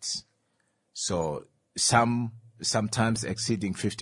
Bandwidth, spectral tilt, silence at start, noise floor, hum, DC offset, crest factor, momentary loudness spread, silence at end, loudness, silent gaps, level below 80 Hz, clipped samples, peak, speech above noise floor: 11.5 kHz; -4 dB/octave; 0 s; -73 dBFS; none; under 0.1%; 22 dB; 14 LU; 0 s; -28 LUFS; none; -60 dBFS; under 0.1%; -6 dBFS; 46 dB